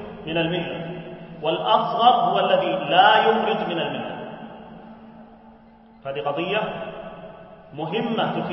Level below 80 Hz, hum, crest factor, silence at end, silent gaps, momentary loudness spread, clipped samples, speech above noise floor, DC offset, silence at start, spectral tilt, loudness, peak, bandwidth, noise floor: -58 dBFS; none; 22 dB; 0 s; none; 22 LU; under 0.1%; 28 dB; under 0.1%; 0 s; -9.5 dB/octave; -21 LUFS; -2 dBFS; 5.8 kHz; -49 dBFS